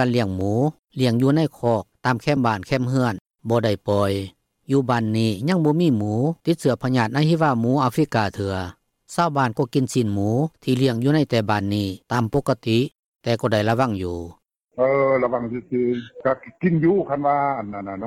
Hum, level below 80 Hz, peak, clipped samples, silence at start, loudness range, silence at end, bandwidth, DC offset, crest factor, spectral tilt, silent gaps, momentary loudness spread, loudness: none; -56 dBFS; -6 dBFS; under 0.1%; 0 s; 2 LU; 0 s; 15.5 kHz; under 0.1%; 14 dB; -7 dB/octave; 3.21-3.25 s, 12.99-13.12 s; 8 LU; -21 LUFS